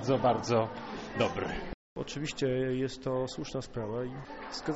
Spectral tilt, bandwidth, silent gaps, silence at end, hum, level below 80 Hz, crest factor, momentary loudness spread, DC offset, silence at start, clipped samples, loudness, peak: -5 dB/octave; 8 kHz; 1.74-1.96 s; 0 s; none; -52 dBFS; 20 dB; 12 LU; under 0.1%; 0 s; under 0.1%; -33 LUFS; -14 dBFS